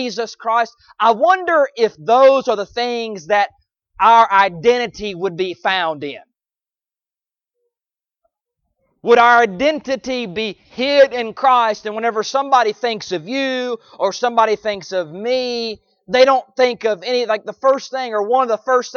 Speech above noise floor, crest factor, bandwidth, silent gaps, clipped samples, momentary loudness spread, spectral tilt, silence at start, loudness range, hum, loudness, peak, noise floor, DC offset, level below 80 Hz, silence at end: over 74 dB; 16 dB; 7 kHz; none; under 0.1%; 12 LU; -3.5 dB/octave; 0 s; 7 LU; none; -16 LUFS; 0 dBFS; under -90 dBFS; under 0.1%; -58 dBFS; 0 s